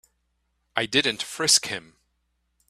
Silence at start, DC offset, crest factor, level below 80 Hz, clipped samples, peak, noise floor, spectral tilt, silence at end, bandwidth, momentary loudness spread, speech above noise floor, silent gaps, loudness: 0.75 s; under 0.1%; 24 dB; -64 dBFS; under 0.1%; -4 dBFS; -73 dBFS; -1 dB/octave; 0.9 s; 15 kHz; 13 LU; 49 dB; none; -22 LUFS